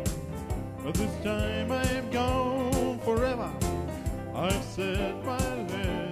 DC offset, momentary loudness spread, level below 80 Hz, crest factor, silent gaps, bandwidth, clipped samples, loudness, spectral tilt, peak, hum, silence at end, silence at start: under 0.1%; 7 LU; -40 dBFS; 16 dB; none; 15.5 kHz; under 0.1%; -30 LUFS; -5.5 dB/octave; -14 dBFS; none; 0 s; 0 s